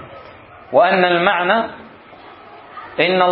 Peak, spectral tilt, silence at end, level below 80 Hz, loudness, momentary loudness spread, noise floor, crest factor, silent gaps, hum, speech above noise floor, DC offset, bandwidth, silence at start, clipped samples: 0 dBFS; -10 dB/octave; 0 s; -60 dBFS; -15 LUFS; 23 LU; -41 dBFS; 18 dB; none; none; 26 dB; under 0.1%; 5.2 kHz; 0 s; under 0.1%